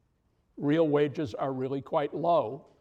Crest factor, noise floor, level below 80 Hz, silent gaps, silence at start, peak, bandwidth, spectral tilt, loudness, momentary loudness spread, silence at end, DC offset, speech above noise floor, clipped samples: 16 dB; -71 dBFS; -70 dBFS; none; 0.55 s; -14 dBFS; 8 kHz; -8.5 dB/octave; -29 LUFS; 8 LU; 0.2 s; under 0.1%; 43 dB; under 0.1%